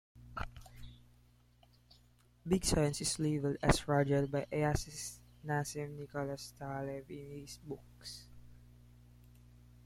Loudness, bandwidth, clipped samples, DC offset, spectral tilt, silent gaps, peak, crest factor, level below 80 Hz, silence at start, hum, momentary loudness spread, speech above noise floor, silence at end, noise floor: -36 LUFS; 16 kHz; under 0.1%; under 0.1%; -5 dB/octave; none; -12 dBFS; 26 dB; -50 dBFS; 0.15 s; 60 Hz at -60 dBFS; 18 LU; 31 dB; 0.3 s; -66 dBFS